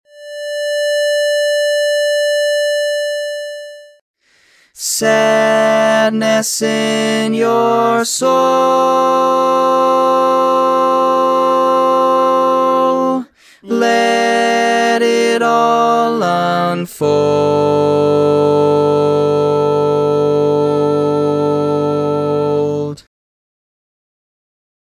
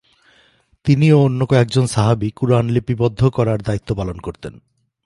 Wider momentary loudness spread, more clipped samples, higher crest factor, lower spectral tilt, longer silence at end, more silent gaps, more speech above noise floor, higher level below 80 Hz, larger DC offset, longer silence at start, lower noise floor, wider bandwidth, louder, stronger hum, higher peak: second, 6 LU vs 14 LU; neither; about the same, 14 dB vs 16 dB; second, -4.5 dB/octave vs -7.5 dB/octave; first, 1.9 s vs 0.5 s; first, 4.01-4.14 s vs none; about the same, 40 dB vs 40 dB; second, -56 dBFS vs -42 dBFS; neither; second, 0.15 s vs 0.85 s; second, -52 dBFS vs -56 dBFS; first, 16 kHz vs 11.5 kHz; first, -13 LUFS vs -17 LUFS; neither; about the same, 0 dBFS vs -2 dBFS